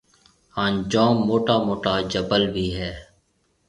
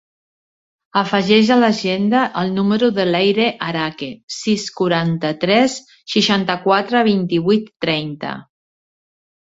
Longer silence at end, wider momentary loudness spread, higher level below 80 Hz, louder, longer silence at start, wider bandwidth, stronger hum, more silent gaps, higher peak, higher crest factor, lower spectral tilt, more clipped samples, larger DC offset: second, 0.65 s vs 1.05 s; about the same, 12 LU vs 10 LU; first, -46 dBFS vs -58 dBFS; second, -22 LUFS vs -17 LUFS; second, 0.55 s vs 0.95 s; first, 11 kHz vs 8 kHz; neither; second, none vs 4.23-4.28 s; about the same, -4 dBFS vs -2 dBFS; about the same, 18 dB vs 16 dB; about the same, -6 dB/octave vs -5 dB/octave; neither; neither